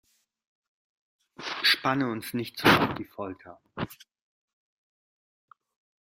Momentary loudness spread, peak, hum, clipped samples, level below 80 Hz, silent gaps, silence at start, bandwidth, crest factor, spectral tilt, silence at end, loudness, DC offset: 18 LU; -6 dBFS; none; under 0.1%; -62 dBFS; none; 1.4 s; 16 kHz; 26 dB; -4.5 dB/octave; 2.1 s; -26 LUFS; under 0.1%